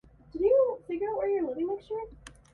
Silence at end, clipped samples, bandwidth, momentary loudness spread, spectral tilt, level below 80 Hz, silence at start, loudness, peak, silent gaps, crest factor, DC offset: 0.25 s; under 0.1%; 11.5 kHz; 14 LU; -7 dB/octave; -58 dBFS; 0.35 s; -29 LUFS; -14 dBFS; none; 16 dB; under 0.1%